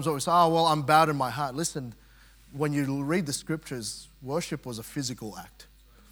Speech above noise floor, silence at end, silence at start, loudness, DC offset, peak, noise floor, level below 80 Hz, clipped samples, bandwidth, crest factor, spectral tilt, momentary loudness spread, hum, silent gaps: 27 dB; 0.45 s; 0 s; -27 LUFS; under 0.1%; -6 dBFS; -55 dBFS; -58 dBFS; under 0.1%; 18 kHz; 22 dB; -4.5 dB/octave; 17 LU; none; none